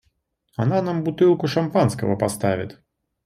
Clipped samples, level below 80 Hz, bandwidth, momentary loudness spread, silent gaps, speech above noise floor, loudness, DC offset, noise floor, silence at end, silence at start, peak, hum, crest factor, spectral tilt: under 0.1%; -56 dBFS; 14 kHz; 9 LU; none; 49 dB; -21 LUFS; under 0.1%; -69 dBFS; 0.55 s; 0.6 s; -6 dBFS; none; 16 dB; -7 dB/octave